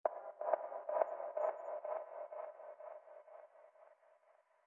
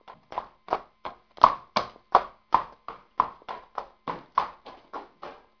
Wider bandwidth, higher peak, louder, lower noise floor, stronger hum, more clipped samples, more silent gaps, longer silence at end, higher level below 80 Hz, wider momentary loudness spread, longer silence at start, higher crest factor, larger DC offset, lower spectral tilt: second, 3.2 kHz vs 5.4 kHz; second, -18 dBFS vs 0 dBFS; second, -43 LUFS vs -28 LUFS; first, -72 dBFS vs -46 dBFS; neither; neither; neither; first, 0.75 s vs 0.25 s; second, under -90 dBFS vs -58 dBFS; about the same, 20 LU vs 22 LU; about the same, 0.05 s vs 0.1 s; about the same, 26 dB vs 30 dB; neither; second, -1.5 dB/octave vs -4.5 dB/octave